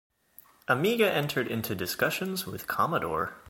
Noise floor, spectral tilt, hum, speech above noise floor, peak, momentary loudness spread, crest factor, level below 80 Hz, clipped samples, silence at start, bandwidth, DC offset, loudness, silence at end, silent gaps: -58 dBFS; -4.5 dB/octave; none; 29 dB; -10 dBFS; 8 LU; 20 dB; -62 dBFS; under 0.1%; 0.7 s; 17 kHz; under 0.1%; -28 LUFS; 0 s; none